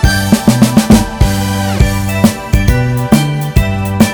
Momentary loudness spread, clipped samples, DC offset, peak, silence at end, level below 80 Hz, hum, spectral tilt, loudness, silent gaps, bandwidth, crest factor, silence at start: 5 LU; 2%; under 0.1%; 0 dBFS; 0 s; -18 dBFS; none; -5.5 dB/octave; -11 LUFS; none; over 20 kHz; 10 dB; 0 s